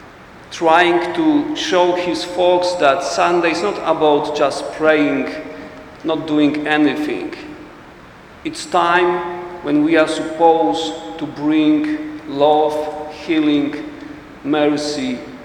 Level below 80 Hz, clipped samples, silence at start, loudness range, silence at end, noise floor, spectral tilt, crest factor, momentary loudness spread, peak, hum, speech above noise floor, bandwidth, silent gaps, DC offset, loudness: -52 dBFS; under 0.1%; 0 s; 4 LU; 0 s; -40 dBFS; -4.5 dB/octave; 16 dB; 15 LU; 0 dBFS; none; 24 dB; 10.5 kHz; none; under 0.1%; -17 LUFS